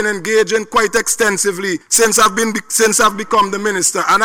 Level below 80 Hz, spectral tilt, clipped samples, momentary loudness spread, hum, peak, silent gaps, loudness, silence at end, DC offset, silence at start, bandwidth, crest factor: -48 dBFS; -1.5 dB/octave; under 0.1%; 5 LU; none; -4 dBFS; none; -13 LUFS; 0 s; under 0.1%; 0 s; over 20 kHz; 12 dB